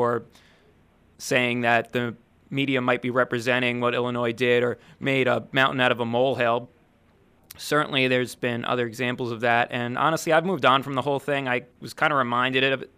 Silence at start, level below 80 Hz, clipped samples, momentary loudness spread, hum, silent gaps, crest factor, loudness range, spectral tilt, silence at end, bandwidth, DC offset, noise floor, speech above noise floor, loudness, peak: 0 s; -66 dBFS; under 0.1%; 8 LU; none; none; 20 dB; 2 LU; -5 dB/octave; 0.1 s; 15.5 kHz; under 0.1%; -59 dBFS; 36 dB; -23 LUFS; -4 dBFS